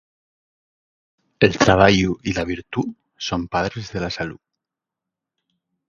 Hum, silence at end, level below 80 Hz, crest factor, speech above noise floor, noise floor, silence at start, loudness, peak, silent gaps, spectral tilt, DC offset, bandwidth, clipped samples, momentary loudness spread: none; 1.55 s; -42 dBFS; 22 dB; 66 dB; -86 dBFS; 1.4 s; -20 LUFS; 0 dBFS; none; -5 dB/octave; under 0.1%; 7.4 kHz; under 0.1%; 14 LU